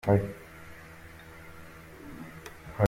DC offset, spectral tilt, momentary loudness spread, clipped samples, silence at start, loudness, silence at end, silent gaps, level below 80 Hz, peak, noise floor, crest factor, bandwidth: under 0.1%; -8 dB/octave; 18 LU; under 0.1%; 0.05 s; -35 LUFS; 0 s; none; -56 dBFS; -10 dBFS; -48 dBFS; 22 dB; 16 kHz